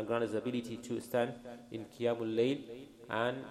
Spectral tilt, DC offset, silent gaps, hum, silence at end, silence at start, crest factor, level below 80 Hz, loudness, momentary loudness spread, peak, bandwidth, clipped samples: -6 dB/octave; under 0.1%; none; none; 0 s; 0 s; 18 dB; -72 dBFS; -36 LUFS; 14 LU; -18 dBFS; 15 kHz; under 0.1%